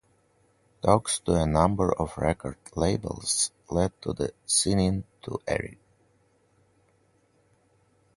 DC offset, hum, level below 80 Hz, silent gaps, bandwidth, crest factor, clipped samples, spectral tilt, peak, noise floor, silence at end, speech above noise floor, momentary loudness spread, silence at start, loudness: under 0.1%; none; -44 dBFS; none; 11.5 kHz; 24 dB; under 0.1%; -4.5 dB/octave; -4 dBFS; -66 dBFS; 2.45 s; 40 dB; 11 LU; 0.85 s; -27 LUFS